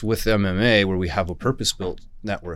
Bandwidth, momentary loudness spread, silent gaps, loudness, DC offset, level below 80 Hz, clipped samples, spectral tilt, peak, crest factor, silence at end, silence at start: 16 kHz; 13 LU; none; -22 LUFS; under 0.1%; -36 dBFS; under 0.1%; -4.5 dB/octave; -6 dBFS; 16 dB; 0 s; 0 s